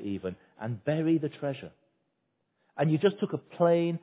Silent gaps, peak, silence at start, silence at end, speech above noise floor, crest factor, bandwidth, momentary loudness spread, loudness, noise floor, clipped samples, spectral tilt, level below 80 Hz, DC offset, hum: none; -12 dBFS; 0 s; 0.05 s; 49 dB; 18 dB; 4 kHz; 15 LU; -29 LUFS; -78 dBFS; under 0.1%; -11.5 dB/octave; -66 dBFS; under 0.1%; none